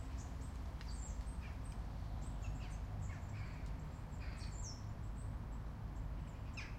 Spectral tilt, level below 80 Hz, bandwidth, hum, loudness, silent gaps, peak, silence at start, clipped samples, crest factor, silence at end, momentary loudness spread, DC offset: -5.5 dB/octave; -48 dBFS; 13.5 kHz; none; -48 LUFS; none; -34 dBFS; 0 s; under 0.1%; 12 dB; 0 s; 2 LU; under 0.1%